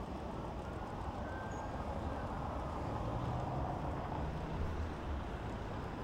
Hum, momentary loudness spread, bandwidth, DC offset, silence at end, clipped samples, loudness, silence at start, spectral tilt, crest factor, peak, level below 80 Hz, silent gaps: none; 4 LU; 11.5 kHz; under 0.1%; 0 s; under 0.1%; -42 LUFS; 0 s; -7.5 dB/octave; 12 dB; -28 dBFS; -46 dBFS; none